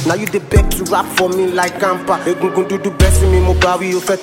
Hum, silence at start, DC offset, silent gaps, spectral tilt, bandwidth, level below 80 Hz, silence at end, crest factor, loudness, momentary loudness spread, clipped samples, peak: none; 0 s; under 0.1%; none; -5 dB/octave; 16.5 kHz; -20 dBFS; 0 s; 14 dB; -15 LUFS; 5 LU; under 0.1%; 0 dBFS